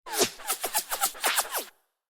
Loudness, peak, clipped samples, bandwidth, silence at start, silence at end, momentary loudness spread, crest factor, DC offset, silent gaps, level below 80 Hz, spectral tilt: -27 LUFS; -8 dBFS; under 0.1%; over 20 kHz; 0.05 s; 0.4 s; 8 LU; 22 dB; under 0.1%; none; -62 dBFS; 0.5 dB/octave